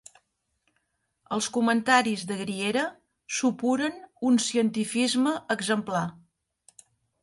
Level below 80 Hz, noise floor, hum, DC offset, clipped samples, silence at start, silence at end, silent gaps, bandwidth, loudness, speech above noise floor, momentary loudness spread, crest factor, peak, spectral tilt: -72 dBFS; -75 dBFS; none; under 0.1%; under 0.1%; 1.3 s; 1.05 s; none; 11.5 kHz; -26 LUFS; 50 dB; 10 LU; 22 dB; -6 dBFS; -3.5 dB/octave